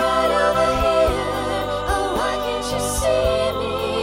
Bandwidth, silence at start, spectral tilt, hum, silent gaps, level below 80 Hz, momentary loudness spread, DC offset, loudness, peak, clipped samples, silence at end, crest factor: 16.5 kHz; 0 s; -4 dB/octave; none; none; -34 dBFS; 6 LU; under 0.1%; -20 LUFS; -6 dBFS; under 0.1%; 0 s; 14 dB